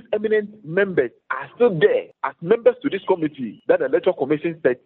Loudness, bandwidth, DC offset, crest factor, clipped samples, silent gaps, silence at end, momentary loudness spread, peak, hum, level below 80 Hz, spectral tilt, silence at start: -21 LUFS; 4.2 kHz; under 0.1%; 18 dB; under 0.1%; none; 0.1 s; 10 LU; -2 dBFS; none; -66 dBFS; -5 dB/octave; 0.1 s